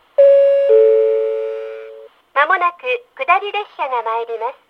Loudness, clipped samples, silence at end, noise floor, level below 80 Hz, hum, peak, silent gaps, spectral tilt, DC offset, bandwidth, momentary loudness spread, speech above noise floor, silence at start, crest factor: -15 LUFS; under 0.1%; 0.15 s; -39 dBFS; -74 dBFS; none; 0 dBFS; none; -2 dB/octave; under 0.1%; 5 kHz; 13 LU; 20 dB; 0.2 s; 14 dB